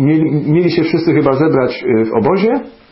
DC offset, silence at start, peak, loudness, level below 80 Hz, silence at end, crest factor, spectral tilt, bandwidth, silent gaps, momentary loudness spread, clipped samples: 0.2%; 0 s; 0 dBFS; -13 LUFS; -50 dBFS; 0.2 s; 12 dB; -12 dB/octave; 5.8 kHz; none; 3 LU; under 0.1%